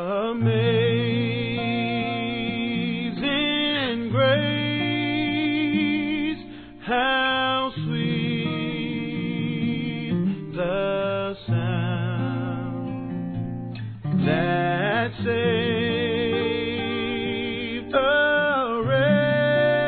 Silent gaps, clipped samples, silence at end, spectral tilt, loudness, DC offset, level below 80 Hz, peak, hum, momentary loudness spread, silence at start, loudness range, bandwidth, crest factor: none; under 0.1%; 0 s; -9.5 dB/octave; -24 LUFS; 0.1%; -52 dBFS; -8 dBFS; none; 8 LU; 0 s; 4 LU; 4.5 kHz; 16 dB